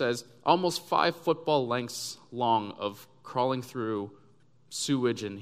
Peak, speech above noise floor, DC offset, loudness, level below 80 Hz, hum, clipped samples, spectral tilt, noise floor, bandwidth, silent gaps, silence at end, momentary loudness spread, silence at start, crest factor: -6 dBFS; 34 dB; under 0.1%; -29 LUFS; -74 dBFS; none; under 0.1%; -4.5 dB/octave; -63 dBFS; 15.5 kHz; none; 0 s; 10 LU; 0 s; 24 dB